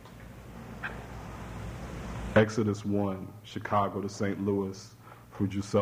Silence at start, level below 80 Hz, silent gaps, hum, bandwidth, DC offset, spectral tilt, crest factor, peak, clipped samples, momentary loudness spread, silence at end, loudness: 0 s; -50 dBFS; none; none; 16 kHz; under 0.1%; -6.5 dB/octave; 22 dB; -10 dBFS; under 0.1%; 20 LU; 0 s; -32 LUFS